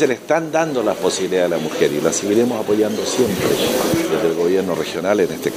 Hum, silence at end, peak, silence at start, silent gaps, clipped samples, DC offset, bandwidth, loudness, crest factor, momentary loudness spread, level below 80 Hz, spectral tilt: none; 0 s; -2 dBFS; 0 s; none; under 0.1%; under 0.1%; 15.5 kHz; -18 LUFS; 16 dB; 2 LU; -54 dBFS; -4 dB/octave